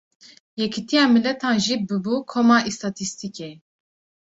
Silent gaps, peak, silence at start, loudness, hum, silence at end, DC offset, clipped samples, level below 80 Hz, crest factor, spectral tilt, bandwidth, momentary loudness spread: none; -6 dBFS; 0.55 s; -21 LUFS; none; 0.75 s; under 0.1%; under 0.1%; -64 dBFS; 18 dB; -4 dB/octave; 8 kHz; 16 LU